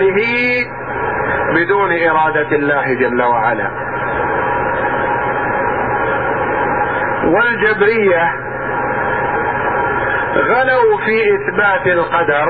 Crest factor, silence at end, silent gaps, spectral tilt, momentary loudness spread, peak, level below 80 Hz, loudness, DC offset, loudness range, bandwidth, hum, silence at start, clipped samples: 12 dB; 0 s; none; -8.5 dB/octave; 6 LU; -2 dBFS; -42 dBFS; -14 LUFS; 0.6%; 2 LU; 5.2 kHz; none; 0 s; under 0.1%